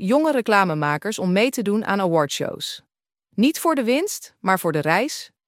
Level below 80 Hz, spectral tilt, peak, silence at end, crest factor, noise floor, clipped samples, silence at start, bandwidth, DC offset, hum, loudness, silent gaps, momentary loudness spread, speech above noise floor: -70 dBFS; -4.5 dB/octave; -2 dBFS; 0.2 s; 18 dB; -70 dBFS; under 0.1%; 0 s; 16.5 kHz; under 0.1%; none; -21 LUFS; none; 9 LU; 49 dB